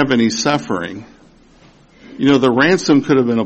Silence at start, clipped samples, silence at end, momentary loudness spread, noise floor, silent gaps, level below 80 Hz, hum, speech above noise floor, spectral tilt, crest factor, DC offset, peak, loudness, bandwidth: 0 s; under 0.1%; 0 s; 11 LU; -47 dBFS; none; -52 dBFS; none; 33 dB; -5 dB/octave; 14 dB; under 0.1%; -2 dBFS; -14 LUFS; 8.6 kHz